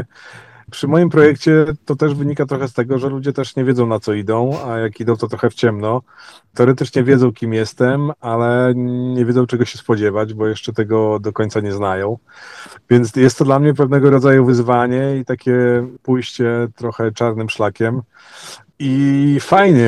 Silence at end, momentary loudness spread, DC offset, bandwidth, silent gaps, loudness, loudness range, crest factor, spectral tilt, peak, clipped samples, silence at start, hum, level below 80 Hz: 0 s; 10 LU; under 0.1%; 12 kHz; none; -16 LUFS; 5 LU; 16 dB; -7.5 dB/octave; 0 dBFS; under 0.1%; 0 s; none; -54 dBFS